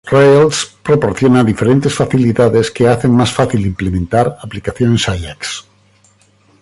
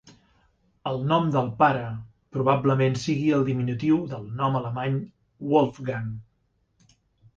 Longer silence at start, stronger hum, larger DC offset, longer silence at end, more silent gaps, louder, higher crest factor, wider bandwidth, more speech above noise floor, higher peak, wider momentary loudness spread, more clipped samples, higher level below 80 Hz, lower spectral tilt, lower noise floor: about the same, 0.05 s vs 0.05 s; neither; neither; second, 1 s vs 1.15 s; neither; first, -13 LUFS vs -25 LUFS; second, 12 dB vs 20 dB; first, 11.5 kHz vs 7.8 kHz; second, 39 dB vs 46 dB; first, 0 dBFS vs -6 dBFS; about the same, 12 LU vs 14 LU; neither; first, -34 dBFS vs -58 dBFS; second, -6 dB/octave vs -7.5 dB/octave; second, -51 dBFS vs -70 dBFS